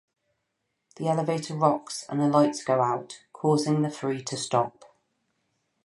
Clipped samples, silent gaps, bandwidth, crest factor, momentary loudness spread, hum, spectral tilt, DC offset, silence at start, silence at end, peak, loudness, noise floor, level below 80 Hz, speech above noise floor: under 0.1%; none; 11.5 kHz; 20 dB; 9 LU; none; -6 dB/octave; under 0.1%; 1 s; 1.15 s; -8 dBFS; -26 LUFS; -79 dBFS; -76 dBFS; 54 dB